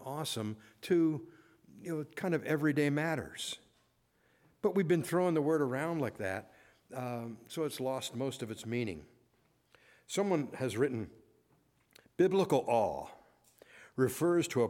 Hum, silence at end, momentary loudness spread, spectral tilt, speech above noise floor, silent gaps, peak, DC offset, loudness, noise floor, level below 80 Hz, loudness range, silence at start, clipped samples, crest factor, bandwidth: none; 0 s; 13 LU; -5.5 dB/octave; 40 dB; none; -16 dBFS; under 0.1%; -34 LUFS; -73 dBFS; -72 dBFS; 5 LU; 0 s; under 0.1%; 20 dB; 17 kHz